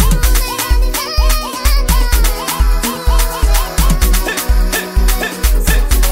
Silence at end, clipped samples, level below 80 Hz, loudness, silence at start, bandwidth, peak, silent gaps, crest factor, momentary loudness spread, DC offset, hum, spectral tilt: 0 s; under 0.1%; -12 dBFS; -15 LUFS; 0 s; 16.5 kHz; 0 dBFS; none; 12 dB; 2 LU; under 0.1%; none; -3.5 dB/octave